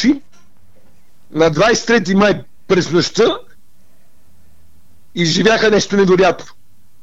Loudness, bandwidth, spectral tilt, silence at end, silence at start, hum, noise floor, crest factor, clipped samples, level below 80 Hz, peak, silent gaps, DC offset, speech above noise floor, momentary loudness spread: -14 LUFS; 8.2 kHz; -4.5 dB/octave; 0.6 s; 0 s; none; -56 dBFS; 16 dB; under 0.1%; -46 dBFS; -2 dBFS; none; 2%; 43 dB; 11 LU